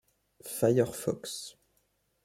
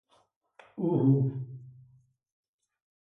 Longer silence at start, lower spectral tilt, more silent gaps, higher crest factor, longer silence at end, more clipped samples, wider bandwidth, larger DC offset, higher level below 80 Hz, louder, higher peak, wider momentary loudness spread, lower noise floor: second, 0.45 s vs 0.75 s; second, -5.5 dB/octave vs -12.5 dB/octave; neither; about the same, 22 dB vs 18 dB; second, 0.75 s vs 1.3 s; neither; first, 16.5 kHz vs 3.6 kHz; neither; about the same, -68 dBFS vs -72 dBFS; second, -31 LUFS vs -28 LUFS; about the same, -12 dBFS vs -14 dBFS; second, 18 LU vs 23 LU; first, -74 dBFS vs -69 dBFS